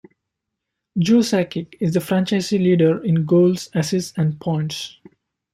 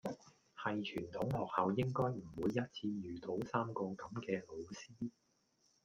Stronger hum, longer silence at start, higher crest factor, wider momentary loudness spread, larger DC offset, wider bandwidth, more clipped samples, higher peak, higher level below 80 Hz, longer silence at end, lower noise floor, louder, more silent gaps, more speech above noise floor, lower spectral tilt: neither; first, 0.95 s vs 0.05 s; second, 14 dB vs 22 dB; about the same, 10 LU vs 12 LU; neither; about the same, 15 kHz vs 15 kHz; neither; first, -4 dBFS vs -20 dBFS; first, -60 dBFS vs -70 dBFS; about the same, 0.65 s vs 0.75 s; about the same, -80 dBFS vs -77 dBFS; first, -19 LUFS vs -41 LUFS; neither; first, 62 dB vs 37 dB; about the same, -6.5 dB/octave vs -7 dB/octave